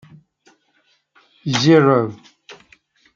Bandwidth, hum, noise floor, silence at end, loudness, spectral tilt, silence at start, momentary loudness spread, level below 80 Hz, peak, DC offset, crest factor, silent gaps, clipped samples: 7.6 kHz; none; -63 dBFS; 0.6 s; -15 LUFS; -6 dB/octave; 1.45 s; 15 LU; -64 dBFS; -2 dBFS; under 0.1%; 18 dB; none; under 0.1%